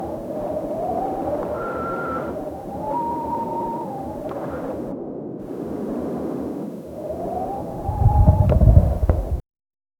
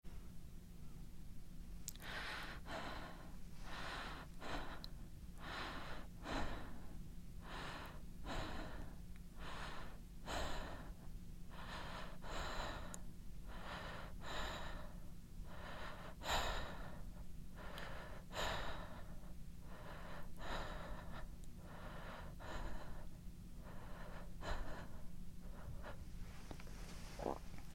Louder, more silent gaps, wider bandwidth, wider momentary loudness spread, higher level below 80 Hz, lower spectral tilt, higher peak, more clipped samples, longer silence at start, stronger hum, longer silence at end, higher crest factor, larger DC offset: first, -24 LUFS vs -51 LUFS; neither; about the same, 16.5 kHz vs 16.5 kHz; first, 15 LU vs 11 LU; first, -26 dBFS vs -52 dBFS; first, -10 dB/octave vs -4 dB/octave; first, 0 dBFS vs -24 dBFS; neither; about the same, 0 s vs 0.05 s; neither; first, 0.6 s vs 0 s; about the same, 22 dB vs 24 dB; neither